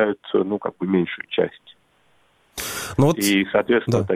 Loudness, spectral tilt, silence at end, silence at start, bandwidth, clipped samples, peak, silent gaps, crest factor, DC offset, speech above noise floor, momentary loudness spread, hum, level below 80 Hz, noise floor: -21 LUFS; -5 dB/octave; 0 s; 0 s; 16.5 kHz; under 0.1%; -4 dBFS; none; 18 dB; under 0.1%; 41 dB; 9 LU; none; -52 dBFS; -61 dBFS